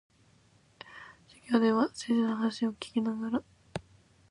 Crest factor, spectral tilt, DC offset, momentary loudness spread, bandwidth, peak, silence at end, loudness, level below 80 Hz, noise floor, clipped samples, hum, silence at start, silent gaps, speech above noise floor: 20 dB; -5.5 dB/octave; under 0.1%; 22 LU; 11 kHz; -12 dBFS; 0.5 s; -30 LUFS; -68 dBFS; -64 dBFS; under 0.1%; none; 0.85 s; none; 35 dB